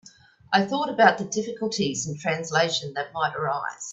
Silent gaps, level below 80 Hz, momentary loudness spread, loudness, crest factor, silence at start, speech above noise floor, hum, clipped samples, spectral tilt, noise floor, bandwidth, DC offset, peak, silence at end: none; -66 dBFS; 9 LU; -24 LUFS; 22 dB; 0.5 s; 20 dB; none; under 0.1%; -3.5 dB/octave; -45 dBFS; 8.4 kHz; under 0.1%; -2 dBFS; 0 s